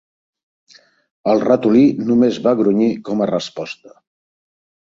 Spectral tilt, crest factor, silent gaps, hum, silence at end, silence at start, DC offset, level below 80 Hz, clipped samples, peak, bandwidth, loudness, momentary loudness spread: -7 dB/octave; 18 dB; none; none; 1 s; 1.25 s; under 0.1%; -60 dBFS; under 0.1%; 0 dBFS; 7.6 kHz; -16 LUFS; 14 LU